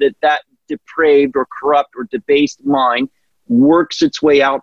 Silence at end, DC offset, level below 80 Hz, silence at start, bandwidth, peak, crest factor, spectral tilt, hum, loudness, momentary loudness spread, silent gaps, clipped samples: 0 s; under 0.1%; -54 dBFS; 0 s; 7.4 kHz; -2 dBFS; 12 dB; -5 dB/octave; none; -14 LUFS; 12 LU; none; under 0.1%